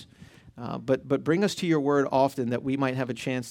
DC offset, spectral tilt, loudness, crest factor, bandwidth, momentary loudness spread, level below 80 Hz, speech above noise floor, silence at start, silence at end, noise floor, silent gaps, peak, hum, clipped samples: under 0.1%; -6 dB/octave; -26 LUFS; 16 dB; 16.5 kHz; 8 LU; -64 dBFS; 25 dB; 0 s; 0 s; -51 dBFS; none; -10 dBFS; none; under 0.1%